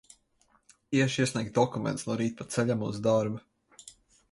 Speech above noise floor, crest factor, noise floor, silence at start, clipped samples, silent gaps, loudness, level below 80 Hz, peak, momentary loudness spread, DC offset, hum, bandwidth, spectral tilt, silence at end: 40 dB; 20 dB; -68 dBFS; 0.9 s; under 0.1%; none; -29 LUFS; -64 dBFS; -10 dBFS; 15 LU; under 0.1%; none; 11.5 kHz; -5.5 dB/octave; 0.4 s